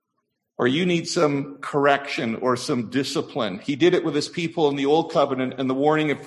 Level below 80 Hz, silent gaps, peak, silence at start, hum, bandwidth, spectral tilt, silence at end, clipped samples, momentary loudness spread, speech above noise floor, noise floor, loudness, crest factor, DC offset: -66 dBFS; none; -4 dBFS; 0.6 s; none; 12 kHz; -5 dB/octave; 0 s; under 0.1%; 7 LU; 55 dB; -77 dBFS; -22 LUFS; 20 dB; under 0.1%